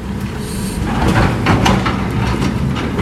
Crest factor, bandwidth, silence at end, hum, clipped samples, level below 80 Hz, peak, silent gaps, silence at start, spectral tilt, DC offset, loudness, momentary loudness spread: 16 dB; 15 kHz; 0 s; none; under 0.1%; -26 dBFS; 0 dBFS; none; 0 s; -6 dB/octave; under 0.1%; -16 LUFS; 9 LU